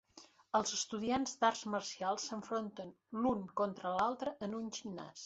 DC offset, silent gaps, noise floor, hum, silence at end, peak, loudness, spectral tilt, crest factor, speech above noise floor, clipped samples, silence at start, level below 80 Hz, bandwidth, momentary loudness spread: under 0.1%; none; -62 dBFS; none; 0 s; -16 dBFS; -38 LUFS; -3 dB/octave; 22 dB; 24 dB; under 0.1%; 0.15 s; -72 dBFS; 8 kHz; 10 LU